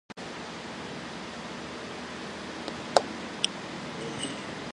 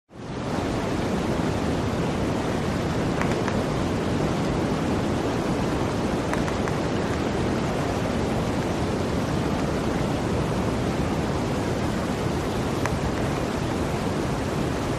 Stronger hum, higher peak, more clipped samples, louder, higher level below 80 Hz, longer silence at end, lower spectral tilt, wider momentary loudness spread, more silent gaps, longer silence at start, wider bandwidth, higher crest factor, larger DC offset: neither; first, 0 dBFS vs -6 dBFS; neither; second, -34 LUFS vs -26 LUFS; second, -60 dBFS vs -38 dBFS; about the same, 0 s vs 0 s; second, -3 dB/octave vs -6 dB/octave; first, 11 LU vs 2 LU; neither; about the same, 0.1 s vs 0.1 s; second, 11.5 kHz vs 15 kHz; first, 34 dB vs 20 dB; neither